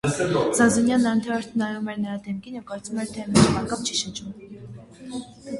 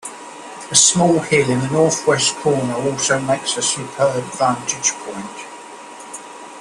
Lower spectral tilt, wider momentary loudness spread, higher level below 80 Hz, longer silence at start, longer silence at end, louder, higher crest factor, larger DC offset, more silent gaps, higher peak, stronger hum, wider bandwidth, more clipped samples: first, -4.5 dB/octave vs -3 dB/octave; about the same, 20 LU vs 22 LU; first, -50 dBFS vs -56 dBFS; about the same, 0.05 s vs 0.05 s; about the same, 0 s vs 0 s; second, -23 LUFS vs -16 LUFS; about the same, 22 dB vs 18 dB; neither; neither; about the same, -2 dBFS vs 0 dBFS; neither; about the same, 11.5 kHz vs 12.5 kHz; neither